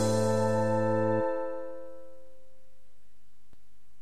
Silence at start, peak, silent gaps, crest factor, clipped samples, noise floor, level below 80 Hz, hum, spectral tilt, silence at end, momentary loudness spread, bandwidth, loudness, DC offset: 0 s; -16 dBFS; none; 16 dB; under 0.1%; -69 dBFS; -70 dBFS; 50 Hz at -70 dBFS; -6.5 dB/octave; 1.9 s; 19 LU; 14 kHz; -29 LUFS; 2%